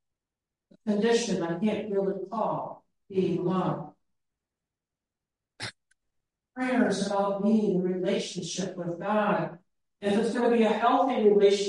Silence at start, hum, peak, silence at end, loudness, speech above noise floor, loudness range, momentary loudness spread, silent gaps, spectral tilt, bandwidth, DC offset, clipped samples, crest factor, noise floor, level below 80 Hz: 0.85 s; none; -10 dBFS; 0 s; -27 LUFS; 64 dB; 7 LU; 14 LU; none; -5.5 dB/octave; 11.5 kHz; under 0.1%; under 0.1%; 18 dB; -89 dBFS; -74 dBFS